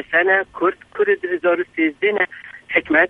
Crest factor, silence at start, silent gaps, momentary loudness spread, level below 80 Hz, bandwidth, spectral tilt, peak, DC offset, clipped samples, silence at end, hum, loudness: 18 dB; 0 s; none; 6 LU; -58 dBFS; 4 kHz; -6 dB/octave; -2 dBFS; under 0.1%; under 0.1%; 0 s; none; -19 LUFS